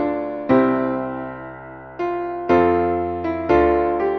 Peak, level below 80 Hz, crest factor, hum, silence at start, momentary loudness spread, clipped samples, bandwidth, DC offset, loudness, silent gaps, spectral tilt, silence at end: -4 dBFS; -42 dBFS; 16 dB; none; 0 s; 16 LU; under 0.1%; 6.2 kHz; under 0.1%; -20 LUFS; none; -9 dB/octave; 0 s